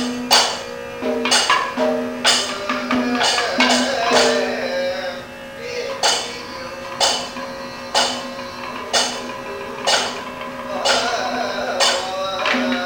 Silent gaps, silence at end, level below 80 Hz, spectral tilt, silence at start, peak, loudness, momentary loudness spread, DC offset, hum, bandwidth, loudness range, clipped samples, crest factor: none; 0 s; -54 dBFS; -1 dB/octave; 0 s; 0 dBFS; -19 LUFS; 14 LU; under 0.1%; none; 18 kHz; 5 LU; under 0.1%; 20 dB